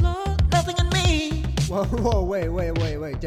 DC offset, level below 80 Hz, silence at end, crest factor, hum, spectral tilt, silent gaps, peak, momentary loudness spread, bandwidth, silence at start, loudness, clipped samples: under 0.1%; -28 dBFS; 0 s; 14 dB; none; -5.5 dB/octave; none; -6 dBFS; 5 LU; 14.5 kHz; 0 s; -23 LUFS; under 0.1%